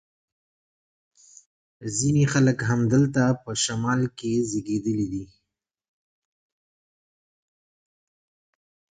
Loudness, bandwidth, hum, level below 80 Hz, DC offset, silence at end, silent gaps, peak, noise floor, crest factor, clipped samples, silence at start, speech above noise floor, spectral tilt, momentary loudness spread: -24 LUFS; 9.4 kHz; none; -58 dBFS; under 0.1%; 3.75 s; none; -8 dBFS; -83 dBFS; 20 dB; under 0.1%; 1.8 s; 60 dB; -5.5 dB/octave; 8 LU